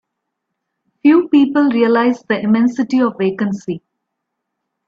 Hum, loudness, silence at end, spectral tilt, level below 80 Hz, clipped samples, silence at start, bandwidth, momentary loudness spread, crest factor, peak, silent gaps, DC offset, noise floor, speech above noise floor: none; -15 LUFS; 1.1 s; -7 dB/octave; -62 dBFS; under 0.1%; 1.05 s; 7.2 kHz; 9 LU; 14 dB; -2 dBFS; none; under 0.1%; -76 dBFS; 62 dB